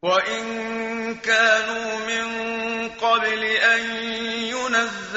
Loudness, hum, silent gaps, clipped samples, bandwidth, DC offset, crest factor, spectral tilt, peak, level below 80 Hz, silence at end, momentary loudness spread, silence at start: -21 LUFS; none; none; under 0.1%; 8 kHz; under 0.1%; 18 dB; 0.5 dB/octave; -4 dBFS; -60 dBFS; 0 s; 9 LU; 0.05 s